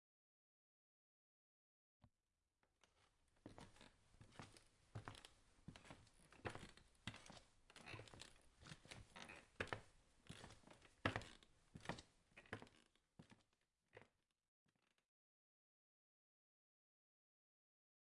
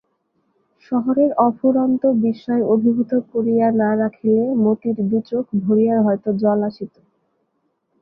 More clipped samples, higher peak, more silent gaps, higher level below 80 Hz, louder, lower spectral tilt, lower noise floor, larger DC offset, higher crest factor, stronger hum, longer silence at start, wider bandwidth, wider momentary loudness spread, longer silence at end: neither; second, -24 dBFS vs -2 dBFS; neither; second, -76 dBFS vs -64 dBFS; second, -57 LUFS vs -18 LUFS; second, -4.5 dB/octave vs -11.5 dB/octave; first, under -90 dBFS vs -69 dBFS; neither; first, 36 dB vs 16 dB; neither; first, 2 s vs 0.9 s; first, 12 kHz vs 5.4 kHz; first, 17 LU vs 5 LU; first, 3.95 s vs 1.15 s